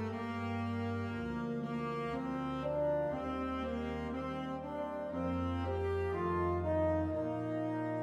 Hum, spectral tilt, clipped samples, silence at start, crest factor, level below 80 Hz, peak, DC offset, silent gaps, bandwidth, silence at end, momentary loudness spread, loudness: none; -8.5 dB/octave; under 0.1%; 0 s; 12 dB; -54 dBFS; -24 dBFS; under 0.1%; none; 10 kHz; 0 s; 6 LU; -37 LUFS